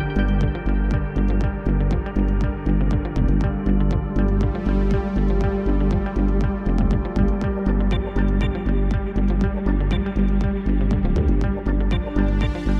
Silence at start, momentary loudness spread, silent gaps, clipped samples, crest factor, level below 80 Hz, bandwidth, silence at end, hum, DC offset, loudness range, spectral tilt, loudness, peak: 0 s; 2 LU; none; under 0.1%; 12 dB; -22 dBFS; 6.2 kHz; 0 s; none; under 0.1%; 1 LU; -9 dB/octave; -22 LUFS; -6 dBFS